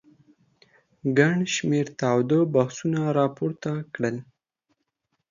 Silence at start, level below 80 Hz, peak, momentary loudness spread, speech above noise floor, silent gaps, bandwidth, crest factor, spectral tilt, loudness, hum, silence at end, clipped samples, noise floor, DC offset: 1.05 s; -66 dBFS; -6 dBFS; 9 LU; 53 dB; none; 7.4 kHz; 20 dB; -6 dB/octave; -24 LUFS; none; 1.1 s; under 0.1%; -77 dBFS; under 0.1%